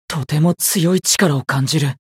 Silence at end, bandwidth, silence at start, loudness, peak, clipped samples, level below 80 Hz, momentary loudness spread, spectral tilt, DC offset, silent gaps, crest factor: 0.2 s; 16.5 kHz; 0.1 s; -16 LUFS; -2 dBFS; under 0.1%; -54 dBFS; 4 LU; -4 dB/octave; under 0.1%; none; 14 dB